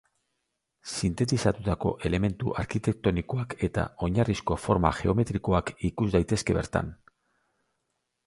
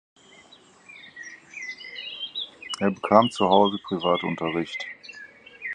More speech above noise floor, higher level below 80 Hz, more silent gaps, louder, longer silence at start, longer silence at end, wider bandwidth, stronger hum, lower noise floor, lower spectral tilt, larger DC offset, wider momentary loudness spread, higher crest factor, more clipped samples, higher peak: first, 53 dB vs 31 dB; first, -42 dBFS vs -64 dBFS; neither; second, -28 LUFS vs -24 LUFS; about the same, 0.85 s vs 0.9 s; first, 1.35 s vs 0 s; about the same, 11.5 kHz vs 10.5 kHz; neither; first, -80 dBFS vs -53 dBFS; first, -6.5 dB/octave vs -5 dB/octave; neither; second, 6 LU vs 22 LU; about the same, 24 dB vs 24 dB; neither; about the same, -4 dBFS vs -2 dBFS